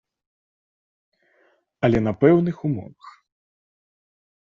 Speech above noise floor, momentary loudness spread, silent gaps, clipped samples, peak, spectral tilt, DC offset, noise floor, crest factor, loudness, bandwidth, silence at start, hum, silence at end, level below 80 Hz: 43 dB; 13 LU; none; under 0.1%; -4 dBFS; -9.5 dB/octave; under 0.1%; -63 dBFS; 22 dB; -21 LUFS; 7.2 kHz; 1.8 s; none; 1.4 s; -50 dBFS